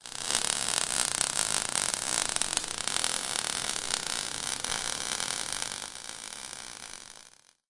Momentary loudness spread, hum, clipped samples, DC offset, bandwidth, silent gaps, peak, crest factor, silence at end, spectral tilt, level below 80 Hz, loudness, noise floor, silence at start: 13 LU; none; under 0.1%; under 0.1%; 11.5 kHz; none; -4 dBFS; 30 dB; 0.4 s; 0.5 dB/octave; -58 dBFS; -29 LUFS; -57 dBFS; 0.05 s